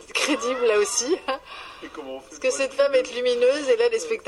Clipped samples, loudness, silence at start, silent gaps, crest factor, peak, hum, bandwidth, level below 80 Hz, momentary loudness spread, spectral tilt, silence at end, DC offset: under 0.1%; -22 LUFS; 0 s; none; 16 dB; -8 dBFS; none; 12.5 kHz; -62 dBFS; 17 LU; -1 dB/octave; 0.05 s; under 0.1%